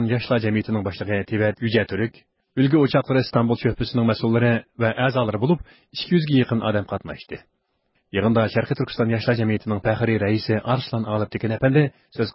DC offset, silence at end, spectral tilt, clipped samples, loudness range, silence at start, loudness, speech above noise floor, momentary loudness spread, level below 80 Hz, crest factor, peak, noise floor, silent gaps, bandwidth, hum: under 0.1%; 0.05 s; -11.5 dB/octave; under 0.1%; 3 LU; 0 s; -22 LUFS; 49 dB; 9 LU; -48 dBFS; 16 dB; -6 dBFS; -70 dBFS; none; 5.8 kHz; none